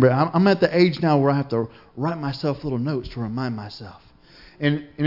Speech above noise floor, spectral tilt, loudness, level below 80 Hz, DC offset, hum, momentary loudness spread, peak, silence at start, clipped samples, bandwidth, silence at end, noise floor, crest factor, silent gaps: 28 dB; -8.5 dB/octave; -22 LUFS; -50 dBFS; under 0.1%; none; 14 LU; -4 dBFS; 0 s; under 0.1%; 5.8 kHz; 0 s; -49 dBFS; 18 dB; none